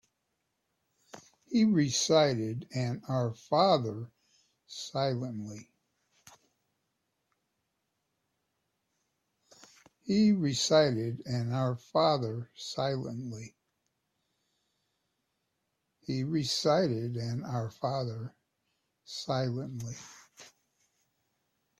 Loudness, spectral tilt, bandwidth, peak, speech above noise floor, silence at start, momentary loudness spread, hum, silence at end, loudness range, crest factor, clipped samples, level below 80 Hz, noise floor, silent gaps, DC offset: -30 LUFS; -5.5 dB/octave; 13.5 kHz; -12 dBFS; 52 dB; 1.15 s; 18 LU; none; 1.35 s; 11 LU; 22 dB; under 0.1%; -70 dBFS; -82 dBFS; none; under 0.1%